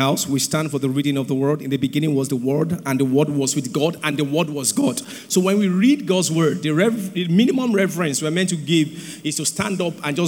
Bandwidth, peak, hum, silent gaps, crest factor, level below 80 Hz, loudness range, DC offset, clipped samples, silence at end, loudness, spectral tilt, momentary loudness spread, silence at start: 19.5 kHz; -4 dBFS; none; none; 16 dB; -66 dBFS; 2 LU; under 0.1%; under 0.1%; 0 s; -20 LUFS; -5 dB/octave; 5 LU; 0 s